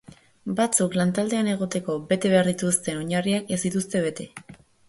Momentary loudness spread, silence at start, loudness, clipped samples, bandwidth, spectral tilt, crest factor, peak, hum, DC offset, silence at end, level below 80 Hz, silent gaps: 10 LU; 0.45 s; -24 LUFS; under 0.1%; 12 kHz; -4.5 dB/octave; 22 dB; -4 dBFS; none; under 0.1%; 0.35 s; -62 dBFS; none